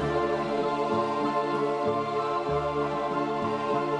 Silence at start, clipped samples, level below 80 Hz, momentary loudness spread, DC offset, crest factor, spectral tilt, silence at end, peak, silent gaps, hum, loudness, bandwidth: 0 s; under 0.1%; -54 dBFS; 2 LU; under 0.1%; 12 dB; -6.5 dB/octave; 0 s; -14 dBFS; none; none; -28 LUFS; 10.5 kHz